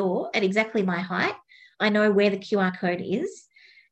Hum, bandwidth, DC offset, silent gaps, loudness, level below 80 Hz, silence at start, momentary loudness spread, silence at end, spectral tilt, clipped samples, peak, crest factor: none; 8.6 kHz; under 0.1%; none; -24 LUFS; -70 dBFS; 0 s; 8 LU; 0.5 s; -6 dB/octave; under 0.1%; -8 dBFS; 18 dB